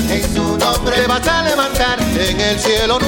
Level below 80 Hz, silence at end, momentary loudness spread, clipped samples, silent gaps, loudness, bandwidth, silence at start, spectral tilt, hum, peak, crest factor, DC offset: -26 dBFS; 0 s; 2 LU; under 0.1%; none; -15 LUFS; 17 kHz; 0 s; -3.5 dB/octave; none; -2 dBFS; 14 dB; under 0.1%